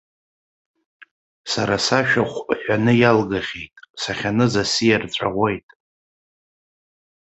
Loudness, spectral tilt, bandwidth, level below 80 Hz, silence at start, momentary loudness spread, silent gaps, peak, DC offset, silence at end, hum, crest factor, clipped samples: -19 LUFS; -5 dB/octave; 8.2 kHz; -52 dBFS; 1.45 s; 14 LU; 3.90-3.94 s; -2 dBFS; under 0.1%; 1.65 s; none; 20 dB; under 0.1%